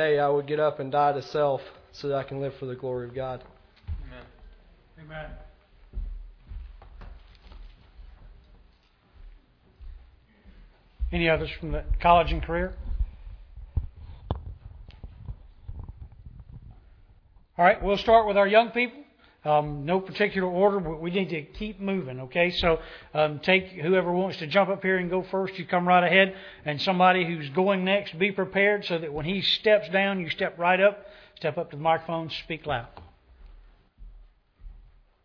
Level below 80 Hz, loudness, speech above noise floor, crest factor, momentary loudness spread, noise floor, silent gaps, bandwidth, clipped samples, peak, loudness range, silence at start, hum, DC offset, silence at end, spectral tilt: -42 dBFS; -25 LUFS; 36 dB; 22 dB; 22 LU; -61 dBFS; none; 5.4 kHz; under 0.1%; -4 dBFS; 20 LU; 0 s; none; under 0.1%; 0.45 s; -7 dB/octave